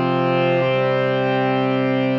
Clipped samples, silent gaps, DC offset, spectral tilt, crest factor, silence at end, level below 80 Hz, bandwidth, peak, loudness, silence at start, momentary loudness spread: under 0.1%; none; under 0.1%; -5 dB/octave; 10 dB; 0 s; -58 dBFS; 6.6 kHz; -8 dBFS; -19 LUFS; 0 s; 1 LU